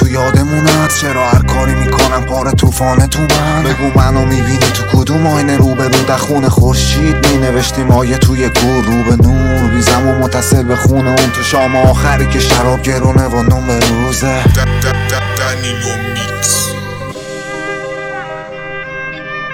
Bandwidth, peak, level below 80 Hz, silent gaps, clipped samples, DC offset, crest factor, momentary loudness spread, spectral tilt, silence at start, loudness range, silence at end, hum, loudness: 17 kHz; 0 dBFS; -22 dBFS; none; 0.3%; under 0.1%; 10 dB; 11 LU; -5 dB/octave; 0 s; 5 LU; 0 s; none; -11 LUFS